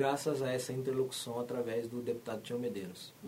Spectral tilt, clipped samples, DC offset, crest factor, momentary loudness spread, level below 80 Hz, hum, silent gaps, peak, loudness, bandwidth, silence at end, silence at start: -5 dB/octave; under 0.1%; under 0.1%; 16 dB; 6 LU; -76 dBFS; none; none; -20 dBFS; -37 LUFS; 16 kHz; 0 s; 0 s